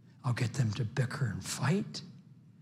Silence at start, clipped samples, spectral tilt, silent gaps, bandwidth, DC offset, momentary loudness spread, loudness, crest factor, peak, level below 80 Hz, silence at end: 0.25 s; under 0.1%; -5.5 dB/octave; none; 15 kHz; under 0.1%; 10 LU; -34 LUFS; 16 dB; -18 dBFS; -70 dBFS; 0.1 s